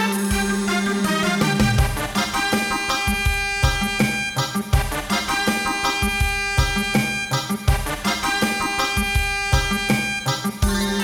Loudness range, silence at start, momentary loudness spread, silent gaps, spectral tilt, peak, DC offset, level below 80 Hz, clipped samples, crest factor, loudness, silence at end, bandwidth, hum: 1 LU; 0 s; 3 LU; none; -4 dB/octave; -4 dBFS; under 0.1%; -28 dBFS; under 0.1%; 16 dB; -21 LUFS; 0 s; 19.5 kHz; none